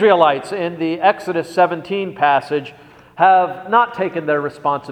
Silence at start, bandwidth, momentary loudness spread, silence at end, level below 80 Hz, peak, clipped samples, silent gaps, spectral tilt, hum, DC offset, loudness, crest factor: 0 s; 11.5 kHz; 10 LU; 0 s; -64 dBFS; 0 dBFS; under 0.1%; none; -6 dB/octave; none; under 0.1%; -17 LUFS; 16 dB